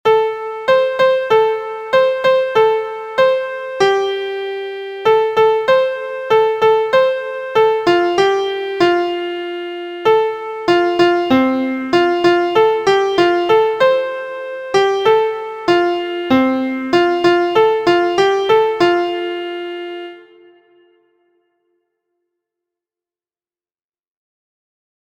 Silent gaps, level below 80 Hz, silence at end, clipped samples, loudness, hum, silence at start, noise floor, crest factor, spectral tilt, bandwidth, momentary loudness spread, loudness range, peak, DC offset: none; -56 dBFS; 4.85 s; under 0.1%; -15 LUFS; none; 0.05 s; under -90 dBFS; 16 dB; -5 dB/octave; 15 kHz; 10 LU; 3 LU; 0 dBFS; under 0.1%